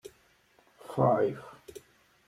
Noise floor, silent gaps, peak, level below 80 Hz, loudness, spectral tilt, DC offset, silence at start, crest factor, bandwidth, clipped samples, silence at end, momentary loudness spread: -65 dBFS; none; -14 dBFS; -66 dBFS; -29 LUFS; -8 dB/octave; under 0.1%; 0.05 s; 20 dB; 15 kHz; under 0.1%; 0.5 s; 26 LU